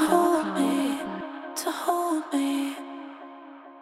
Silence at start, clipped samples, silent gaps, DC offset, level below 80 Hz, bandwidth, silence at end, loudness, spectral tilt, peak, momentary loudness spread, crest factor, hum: 0 s; under 0.1%; none; under 0.1%; -70 dBFS; 16.5 kHz; 0 s; -27 LUFS; -4 dB/octave; -6 dBFS; 20 LU; 20 dB; none